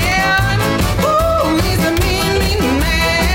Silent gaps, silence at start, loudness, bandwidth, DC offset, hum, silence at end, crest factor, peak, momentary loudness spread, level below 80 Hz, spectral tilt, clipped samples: none; 0 s; -14 LUFS; 16.5 kHz; under 0.1%; none; 0 s; 8 dB; -6 dBFS; 2 LU; -22 dBFS; -4.5 dB/octave; under 0.1%